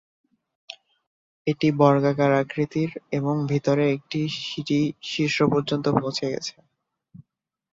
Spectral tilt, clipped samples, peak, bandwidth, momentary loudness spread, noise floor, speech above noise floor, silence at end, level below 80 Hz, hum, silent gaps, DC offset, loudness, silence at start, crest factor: -6.5 dB/octave; under 0.1%; -2 dBFS; 7.8 kHz; 12 LU; -80 dBFS; 57 dB; 0.5 s; -62 dBFS; none; 1.07-1.45 s; under 0.1%; -23 LUFS; 0.7 s; 22 dB